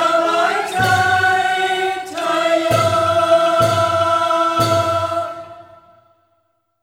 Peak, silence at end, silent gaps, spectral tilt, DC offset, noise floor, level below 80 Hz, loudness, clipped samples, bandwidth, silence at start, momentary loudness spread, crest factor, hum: -2 dBFS; 1.2 s; none; -4 dB/octave; under 0.1%; -65 dBFS; -54 dBFS; -16 LUFS; under 0.1%; 17 kHz; 0 s; 7 LU; 14 dB; none